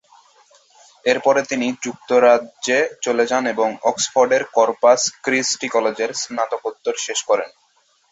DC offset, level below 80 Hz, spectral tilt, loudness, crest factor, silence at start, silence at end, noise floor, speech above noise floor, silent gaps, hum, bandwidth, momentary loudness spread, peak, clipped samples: under 0.1%; -68 dBFS; -2 dB/octave; -19 LUFS; 18 dB; 1.05 s; 0.65 s; -53 dBFS; 35 dB; none; none; 8.2 kHz; 9 LU; -2 dBFS; under 0.1%